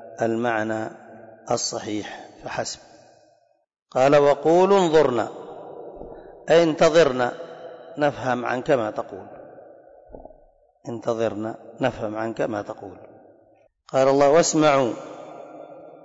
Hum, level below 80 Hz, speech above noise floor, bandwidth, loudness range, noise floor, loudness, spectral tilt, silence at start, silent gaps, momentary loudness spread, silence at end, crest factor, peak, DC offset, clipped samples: none; -56 dBFS; 41 dB; 8 kHz; 9 LU; -62 dBFS; -21 LUFS; -4.5 dB/octave; 0 s; 3.82-3.86 s; 23 LU; 0.15 s; 16 dB; -8 dBFS; under 0.1%; under 0.1%